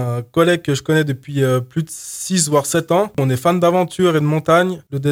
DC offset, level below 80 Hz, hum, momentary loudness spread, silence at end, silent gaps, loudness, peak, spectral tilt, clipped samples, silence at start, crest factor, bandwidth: under 0.1%; -54 dBFS; none; 7 LU; 0 s; none; -17 LUFS; 0 dBFS; -5 dB/octave; under 0.1%; 0 s; 16 dB; 17 kHz